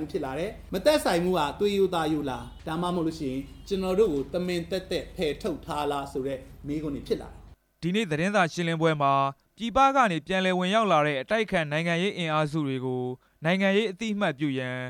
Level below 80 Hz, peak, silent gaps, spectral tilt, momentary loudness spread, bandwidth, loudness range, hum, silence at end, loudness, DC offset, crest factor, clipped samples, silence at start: -50 dBFS; -10 dBFS; none; -5.5 dB/octave; 10 LU; 18 kHz; 7 LU; none; 0 s; -27 LUFS; under 0.1%; 18 dB; under 0.1%; 0 s